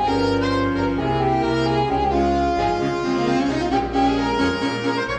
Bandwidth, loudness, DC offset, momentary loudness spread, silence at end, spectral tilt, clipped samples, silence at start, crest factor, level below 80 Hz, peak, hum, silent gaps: 9.4 kHz; -20 LUFS; under 0.1%; 2 LU; 0 s; -6.5 dB/octave; under 0.1%; 0 s; 12 dB; -36 dBFS; -8 dBFS; none; none